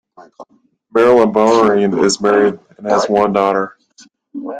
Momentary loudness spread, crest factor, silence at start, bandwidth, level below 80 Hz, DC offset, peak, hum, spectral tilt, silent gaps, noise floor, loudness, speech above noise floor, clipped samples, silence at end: 14 LU; 14 dB; 0.2 s; 9.4 kHz; -54 dBFS; under 0.1%; 0 dBFS; none; -5 dB/octave; none; -48 dBFS; -13 LUFS; 35 dB; under 0.1%; 0 s